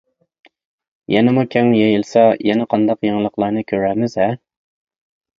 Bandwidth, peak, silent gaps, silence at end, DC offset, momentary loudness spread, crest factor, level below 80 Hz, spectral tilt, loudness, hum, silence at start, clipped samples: 7.6 kHz; 0 dBFS; none; 1.05 s; under 0.1%; 6 LU; 16 dB; -56 dBFS; -7.5 dB/octave; -16 LUFS; none; 1.1 s; under 0.1%